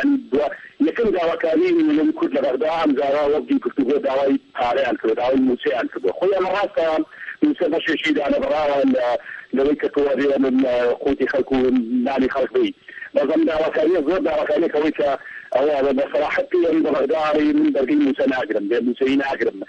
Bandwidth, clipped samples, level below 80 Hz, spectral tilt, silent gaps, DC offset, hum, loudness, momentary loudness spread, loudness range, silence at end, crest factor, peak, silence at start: 7.6 kHz; under 0.1%; -52 dBFS; -6 dB/octave; none; under 0.1%; none; -20 LUFS; 4 LU; 1 LU; 0.05 s; 14 dB; -4 dBFS; 0 s